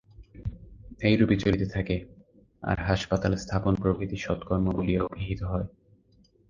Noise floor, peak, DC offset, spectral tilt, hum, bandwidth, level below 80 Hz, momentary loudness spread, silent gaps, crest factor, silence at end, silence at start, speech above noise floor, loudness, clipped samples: -62 dBFS; -8 dBFS; under 0.1%; -7 dB/octave; none; 7.4 kHz; -42 dBFS; 14 LU; none; 20 dB; 0.85 s; 0.2 s; 35 dB; -28 LUFS; under 0.1%